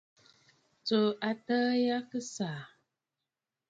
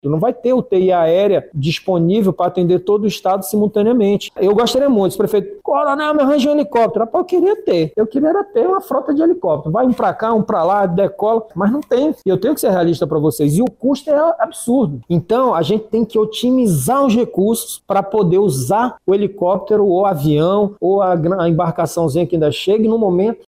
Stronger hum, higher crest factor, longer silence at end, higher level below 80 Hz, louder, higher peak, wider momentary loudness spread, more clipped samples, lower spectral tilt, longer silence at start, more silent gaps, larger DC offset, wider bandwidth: neither; first, 18 dB vs 12 dB; first, 1.05 s vs 0.15 s; second, -80 dBFS vs -50 dBFS; second, -32 LUFS vs -15 LUFS; second, -16 dBFS vs -2 dBFS; first, 11 LU vs 4 LU; neither; second, -5 dB/octave vs -6.5 dB/octave; first, 0.85 s vs 0.05 s; neither; neither; second, 8.6 kHz vs 16 kHz